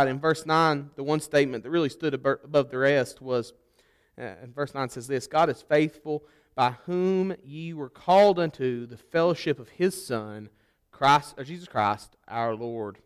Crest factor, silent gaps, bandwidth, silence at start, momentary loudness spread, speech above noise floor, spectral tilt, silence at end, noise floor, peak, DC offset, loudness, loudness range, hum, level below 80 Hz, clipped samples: 16 dB; none; 15 kHz; 0 s; 15 LU; 39 dB; -5.5 dB/octave; 0.1 s; -65 dBFS; -10 dBFS; under 0.1%; -26 LUFS; 3 LU; none; -64 dBFS; under 0.1%